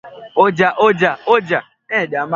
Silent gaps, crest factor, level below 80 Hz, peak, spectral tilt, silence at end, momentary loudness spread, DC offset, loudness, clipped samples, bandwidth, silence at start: none; 16 dB; -60 dBFS; 0 dBFS; -6 dB/octave; 0 s; 8 LU; under 0.1%; -15 LUFS; under 0.1%; 7.4 kHz; 0.05 s